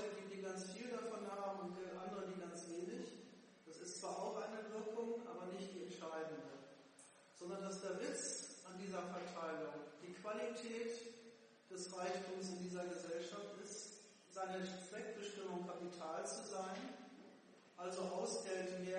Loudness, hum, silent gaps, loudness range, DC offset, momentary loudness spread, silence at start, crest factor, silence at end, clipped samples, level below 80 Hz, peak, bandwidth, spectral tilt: -48 LUFS; none; none; 2 LU; under 0.1%; 13 LU; 0 s; 18 dB; 0 s; under 0.1%; under -90 dBFS; -32 dBFS; 10.5 kHz; -4 dB/octave